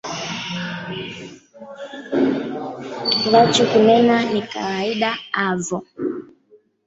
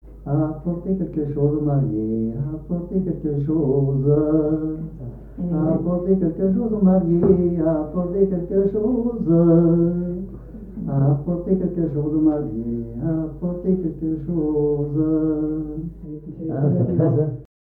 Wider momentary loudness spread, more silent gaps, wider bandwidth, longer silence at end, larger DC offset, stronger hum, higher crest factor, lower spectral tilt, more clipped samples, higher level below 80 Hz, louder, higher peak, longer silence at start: first, 20 LU vs 11 LU; neither; first, 8.2 kHz vs 2 kHz; first, 0.6 s vs 0.2 s; neither; neither; about the same, 18 dB vs 16 dB; second, -4.5 dB/octave vs -14 dB/octave; neither; second, -60 dBFS vs -40 dBFS; about the same, -19 LUFS vs -21 LUFS; about the same, -2 dBFS vs -4 dBFS; about the same, 0.05 s vs 0.05 s